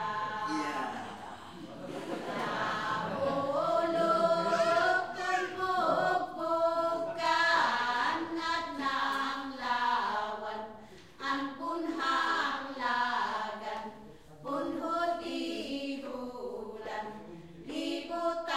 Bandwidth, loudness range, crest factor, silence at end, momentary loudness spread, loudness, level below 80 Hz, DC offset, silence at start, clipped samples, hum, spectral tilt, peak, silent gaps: 14.5 kHz; 7 LU; 18 dB; 0 s; 14 LU; -32 LUFS; -68 dBFS; 0.1%; 0 s; under 0.1%; none; -4 dB/octave; -14 dBFS; none